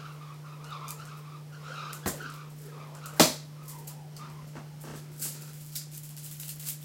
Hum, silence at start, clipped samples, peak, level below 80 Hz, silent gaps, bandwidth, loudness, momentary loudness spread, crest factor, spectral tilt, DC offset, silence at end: none; 0 s; under 0.1%; -4 dBFS; -68 dBFS; none; 17 kHz; -34 LUFS; 19 LU; 32 dB; -3 dB/octave; under 0.1%; 0 s